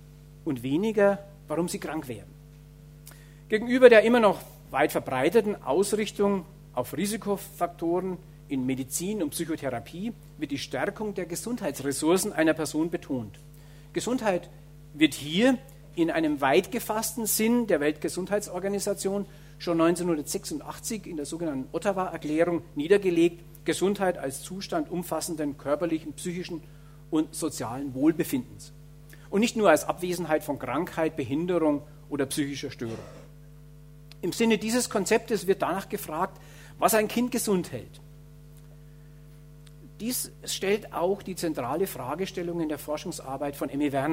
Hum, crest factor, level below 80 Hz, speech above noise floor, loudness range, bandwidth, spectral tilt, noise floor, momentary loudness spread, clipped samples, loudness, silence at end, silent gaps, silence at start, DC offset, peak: none; 26 dB; -54 dBFS; 22 dB; 8 LU; 16 kHz; -4.5 dB/octave; -49 dBFS; 12 LU; under 0.1%; -27 LUFS; 0 s; none; 0 s; under 0.1%; -2 dBFS